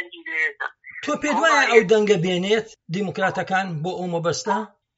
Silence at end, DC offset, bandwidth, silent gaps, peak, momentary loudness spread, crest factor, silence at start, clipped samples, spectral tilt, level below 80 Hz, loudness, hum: 0.3 s; under 0.1%; 8 kHz; none; -2 dBFS; 12 LU; 20 dB; 0 s; under 0.1%; -3 dB/octave; -64 dBFS; -21 LUFS; none